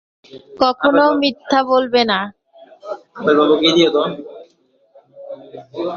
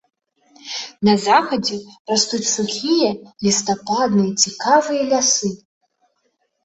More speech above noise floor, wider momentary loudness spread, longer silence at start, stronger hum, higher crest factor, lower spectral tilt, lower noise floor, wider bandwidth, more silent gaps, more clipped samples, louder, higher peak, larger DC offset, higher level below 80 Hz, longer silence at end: second, 41 dB vs 50 dB; first, 22 LU vs 11 LU; second, 0.35 s vs 0.65 s; neither; about the same, 16 dB vs 18 dB; first, -4.5 dB/octave vs -3 dB/octave; second, -57 dBFS vs -68 dBFS; second, 7 kHz vs 8.2 kHz; second, none vs 1.99-2.05 s; neither; first, -15 LUFS vs -18 LUFS; about the same, 0 dBFS vs -2 dBFS; neither; about the same, -60 dBFS vs -60 dBFS; second, 0 s vs 1.1 s